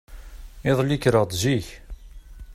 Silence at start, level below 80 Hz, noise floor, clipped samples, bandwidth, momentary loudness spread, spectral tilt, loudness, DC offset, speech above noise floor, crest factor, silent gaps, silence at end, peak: 0.1 s; -42 dBFS; -41 dBFS; under 0.1%; 15 kHz; 15 LU; -5.5 dB/octave; -22 LUFS; under 0.1%; 20 dB; 20 dB; none; 0 s; -4 dBFS